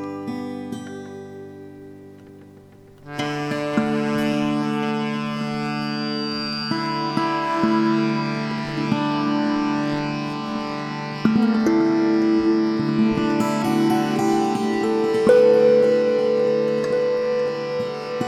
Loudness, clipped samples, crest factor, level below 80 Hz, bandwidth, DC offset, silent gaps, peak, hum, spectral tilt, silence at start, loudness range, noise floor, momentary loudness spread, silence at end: -21 LUFS; under 0.1%; 18 dB; -56 dBFS; 14 kHz; under 0.1%; none; -2 dBFS; none; -6.5 dB/octave; 0 s; 8 LU; -46 dBFS; 11 LU; 0 s